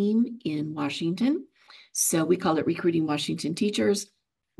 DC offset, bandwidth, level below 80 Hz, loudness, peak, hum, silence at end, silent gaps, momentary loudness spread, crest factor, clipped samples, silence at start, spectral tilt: under 0.1%; 12.5 kHz; -68 dBFS; -26 LUFS; -12 dBFS; none; 0.55 s; none; 7 LU; 16 dB; under 0.1%; 0 s; -4.5 dB/octave